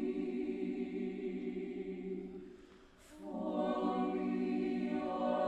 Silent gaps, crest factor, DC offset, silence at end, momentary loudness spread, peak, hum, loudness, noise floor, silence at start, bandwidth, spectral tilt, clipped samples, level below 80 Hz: none; 16 dB; under 0.1%; 0 s; 14 LU; -22 dBFS; none; -39 LUFS; -60 dBFS; 0 s; 9 kHz; -8 dB/octave; under 0.1%; -68 dBFS